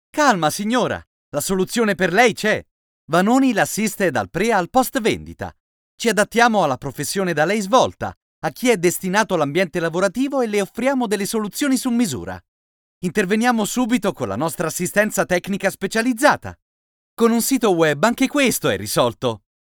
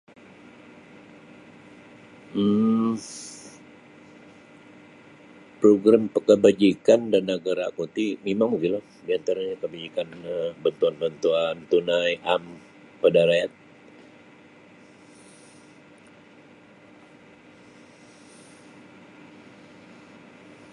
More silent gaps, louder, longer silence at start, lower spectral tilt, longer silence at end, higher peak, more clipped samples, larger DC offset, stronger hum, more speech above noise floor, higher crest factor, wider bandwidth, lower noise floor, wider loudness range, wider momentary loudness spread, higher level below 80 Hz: first, 1.07-1.32 s, 2.71-3.08 s, 5.60-5.98 s, 8.17-8.42 s, 12.48-13.01 s, 16.62-17.17 s vs none; first, -19 LUFS vs -23 LUFS; second, 0.15 s vs 2.35 s; second, -4 dB/octave vs -5.5 dB/octave; second, 0.3 s vs 7.25 s; first, 0 dBFS vs -4 dBFS; neither; neither; neither; first, over 71 dB vs 29 dB; about the same, 18 dB vs 22 dB; first, over 20 kHz vs 11 kHz; first, under -90 dBFS vs -51 dBFS; second, 3 LU vs 7 LU; second, 9 LU vs 14 LU; first, -52 dBFS vs -68 dBFS